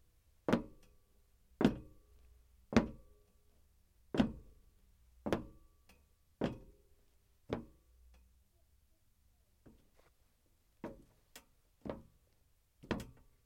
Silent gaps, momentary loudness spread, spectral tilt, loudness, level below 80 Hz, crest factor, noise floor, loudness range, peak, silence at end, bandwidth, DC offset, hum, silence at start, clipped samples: none; 25 LU; -6.5 dB/octave; -39 LUFS; -60 dBFS; 32 dB; -73 dBFS; 17 LU; -12 dBFS; 0.35 s; 16.5 kHz; under 0.1%; none; 0.5 s; under 0.1%